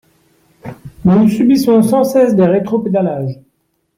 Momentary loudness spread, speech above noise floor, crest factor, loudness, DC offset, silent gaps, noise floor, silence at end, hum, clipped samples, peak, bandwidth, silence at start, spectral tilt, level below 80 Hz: 15 LU; 52 dB; 12 dB; -12 LUFS; under 0.1%; none; -63 dBFS; 0.65 s; none; under 0.1%; -2 dBFS; 16 kHz; 0.65 s; -7.5 dB/octave; -48 dBFS